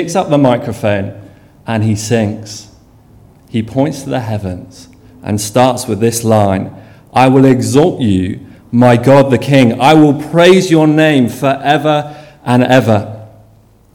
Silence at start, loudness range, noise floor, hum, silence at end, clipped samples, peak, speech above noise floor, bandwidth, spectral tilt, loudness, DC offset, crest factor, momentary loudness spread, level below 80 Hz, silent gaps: 0 s; 9 LU; -45 dBFS; none; 0.65 s; 0.6%; 0 dBFS; 35 dB; 17.5 kHz; -6 dB/octave; -11 LUFS; under 0.1%; 12 dB; 18 LU; -46 dBFS; none